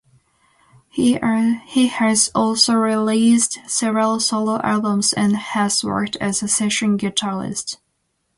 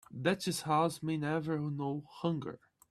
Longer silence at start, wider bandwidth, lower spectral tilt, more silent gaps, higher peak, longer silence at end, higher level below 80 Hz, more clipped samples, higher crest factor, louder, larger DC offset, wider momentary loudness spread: first, 0.95 s vs 0.1 s; second, 11.5 kHz vs 14 kHz; second, -3 dB/octave vs -5.5 dB/octave; neither; first, -2 dBFS vs -16 dBFS; first, 0.6 s vs 0.35 s; first, -58 dBFS vs -72 dBFS; neither; about the same, 18 dB vs 18 dB; first, -18 LUFS vs -35 LUFS; neither; about the same, 7 LU vs 8 LU